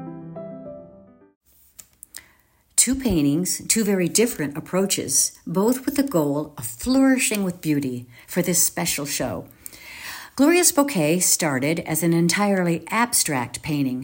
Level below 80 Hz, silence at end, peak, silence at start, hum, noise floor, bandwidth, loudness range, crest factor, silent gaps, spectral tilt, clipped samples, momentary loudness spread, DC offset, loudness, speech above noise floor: -50 dBFS; 0 s; -2 dBFS; 0 s; none; -60 dBFS; 16.5 kHz; 4 LU; 20 dB; 1.36-1.41 s; -3.5 dB/octave; under 0.1%; 18 LU; under 0.1%; -20 LUFS; 38 dB